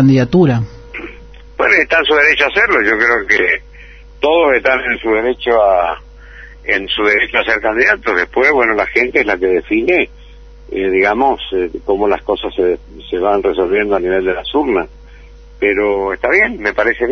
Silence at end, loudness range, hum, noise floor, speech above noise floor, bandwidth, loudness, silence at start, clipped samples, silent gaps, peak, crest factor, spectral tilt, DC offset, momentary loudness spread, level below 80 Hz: 0 s; 4 LU; none; -37 dBFS; 23 dB; 6.6 kHz; -13 LUFS; 0 s; under 0.1%; none; 0 dBFS; 14 dB; -6 dB/octave; under 0.1%; 9 LU; -38 dBFS